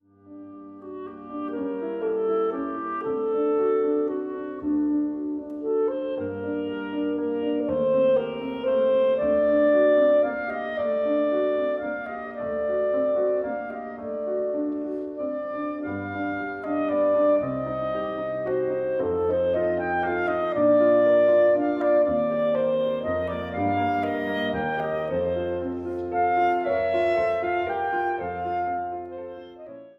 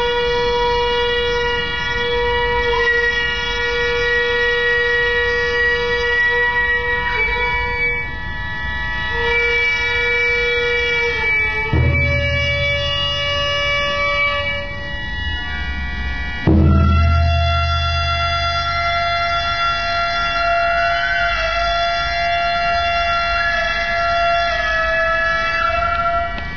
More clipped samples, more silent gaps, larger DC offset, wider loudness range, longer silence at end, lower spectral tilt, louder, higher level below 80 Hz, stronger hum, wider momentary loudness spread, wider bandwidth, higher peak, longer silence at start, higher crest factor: neither; neither; second, under 0.1% vs 2%; first, 6 LU vs 2 LU; about the same, 0.05 s vs 0 s; first, -8.5 dB/octave vs -5 dB/octave; second, -25 LUFS vs -17 LUFS; second, -58 dBFS vs -28 dBFS; neither; first, 11 LU vs 6 LU; about the same, 5.6 kHz vs 5.4 kHz; second, -10 dBFS vs -4 dBFS; first, 0.25 s vs 0 s; about the same, 14 dB vs 14 dB